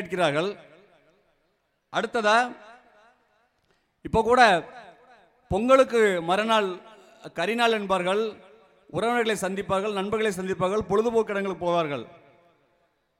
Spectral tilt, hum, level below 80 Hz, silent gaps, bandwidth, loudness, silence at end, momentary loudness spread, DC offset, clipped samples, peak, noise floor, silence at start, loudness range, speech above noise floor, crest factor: -4.5 dB/octave; none; -56 dBFS; none; 16 kHz; -24 LUFS; 1.1 s; 13 LU; under 0.1%; under 0.1%; -4 dBFS; -72 dBFS; 0 s; 6 LU; 48 dB; 22 dB